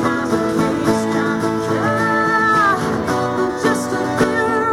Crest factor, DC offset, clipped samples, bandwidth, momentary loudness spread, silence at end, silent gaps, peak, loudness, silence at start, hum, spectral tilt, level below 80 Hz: 14 dB; under 0.1%; under 0.1%; 17 kHz; 5 LU; 0 s; none; -2 dBFS; -17 LUFS; 0 s; none; -5.5 dB/octave; -46 dBFS